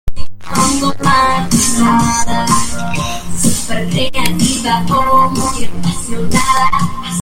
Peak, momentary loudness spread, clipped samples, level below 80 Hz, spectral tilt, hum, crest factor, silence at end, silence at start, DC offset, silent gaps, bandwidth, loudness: 0 dBFS; 8 LU; under 0.1%; -28 dBFS; -3.5 dB/octave; none; 12 dB; 0 s; 0.05 s; under 0.1%; none; 17 kHz; -14 LUFS